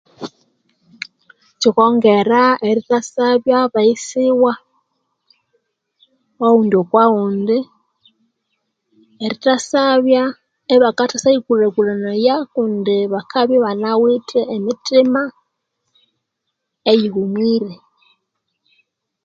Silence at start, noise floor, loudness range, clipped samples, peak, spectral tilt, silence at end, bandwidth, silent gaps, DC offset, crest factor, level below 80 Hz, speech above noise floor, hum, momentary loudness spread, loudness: 0.2 s; -76 dBFS; 4 LU; under 0.1%; 0 dBFS; -5 dB/octave; 1.5 s; 9 kHz; none; under 0.1%; 16 dB; -66 dBFS; 61 dB; none; 12 LU; -15 LUFS